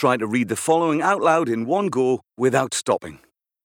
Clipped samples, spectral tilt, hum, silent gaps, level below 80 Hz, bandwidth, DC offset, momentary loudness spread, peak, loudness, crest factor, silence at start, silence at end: under 0.1%; -4.5 dB/octave; none; none; -68 dBFS; 19.5 kHz; under 0.1%; 4 LU; -4 dBFS; -21 LUFS; 18 dB; 0 s; 0.5 s